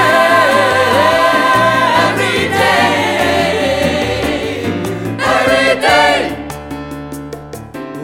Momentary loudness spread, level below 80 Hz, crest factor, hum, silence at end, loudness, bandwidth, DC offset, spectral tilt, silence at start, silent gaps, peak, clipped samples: 16 LU; -38 dBFS; 12 dB; none; 0 s; -12 LUFS; 16.5 kHz; under 0.1%; -4 dB/octave; 0 s; none; 0 dBFS; under 0.1%